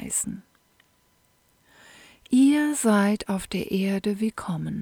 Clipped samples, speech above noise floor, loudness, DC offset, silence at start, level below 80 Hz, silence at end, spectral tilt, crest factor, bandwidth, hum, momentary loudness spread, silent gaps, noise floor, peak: under 0.1%; 39 dB; -24 LUFS; under 0.1%; 0 s; -58 dBFS; 0 s; -5 dB/octave; 16 dB; 19 kHz; none; 11 LU; none; -65 dBFS; -8 dBFS